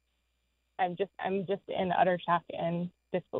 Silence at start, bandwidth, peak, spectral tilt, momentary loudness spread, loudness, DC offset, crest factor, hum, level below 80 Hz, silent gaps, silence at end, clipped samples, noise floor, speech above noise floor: 0.8 s; 4.2 kHz; -14 dBFS; -9 dB/octave; 9 LU; -32 LUFS; under 0.1%; 20 dB; none; -72 dBFS; none; 0 s; under 0.1%; -77 dBFS; 46 dB